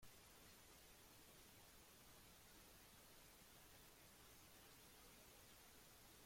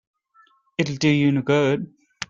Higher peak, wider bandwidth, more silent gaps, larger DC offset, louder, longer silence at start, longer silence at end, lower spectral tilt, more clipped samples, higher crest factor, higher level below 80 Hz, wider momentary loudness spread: second, -52 dBFS vs -4 dBFS; first, 16.5 kHz vs 7.6 kHz; neither; neither; second, -65 LUFS vs -21 LUFS; second, 0 s vs 0.8 s; about the same, 0 s vs 0.05 s; second, -2.5 dB/octave vs -6 dB/octave; neither; second, 14 dB vs 20 dB; second, -78 dBFS vs -60 dBFS; second, 1 LU vs 11 LU